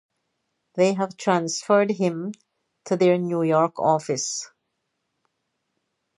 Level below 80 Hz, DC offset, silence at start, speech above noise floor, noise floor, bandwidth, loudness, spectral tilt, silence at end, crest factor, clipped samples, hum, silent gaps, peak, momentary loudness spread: -76 dBFS; under 0.1%; 0.75 s; 55 dB; -77 dBFS; 11.5 kHz; -22 LUFS; -5 dB/octave; 1.7 s; 18 dB; under 0.1%; none; none; -6 dBFS; 12 LU